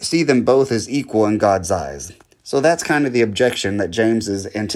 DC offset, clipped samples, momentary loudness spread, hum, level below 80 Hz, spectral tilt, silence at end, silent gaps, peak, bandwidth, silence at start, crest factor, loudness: under 0.1%; under 0.1%; 8 LU; none; -52 dBFS; -4.5 dB/octave; 0 s; none; -2 dBFS; 14 kHz; 0 s; 16 dB; -18 LUFS